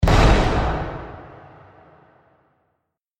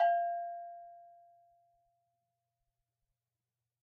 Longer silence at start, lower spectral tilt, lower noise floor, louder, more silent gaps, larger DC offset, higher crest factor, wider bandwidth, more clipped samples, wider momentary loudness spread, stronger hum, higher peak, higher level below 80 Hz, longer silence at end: about the same, 0 s vs 0 s; first, -6 dB/octave vs 3.5 dB/octave; second, -75 dBFS vs under -90 dBFS; first, -19 LUFS vs -36 LUFS; neither; neither; about the same, 20 dB vs 20 dB; first, 12.5 kHz vs 4.6 kHz; neither; about the same, 24 LU vs 23 LU; neither; first, -2 dBFS vs -20 dBFS; first, -24 dBFS vs under -90 dBFS; second, 1.9 s vs 2.85 s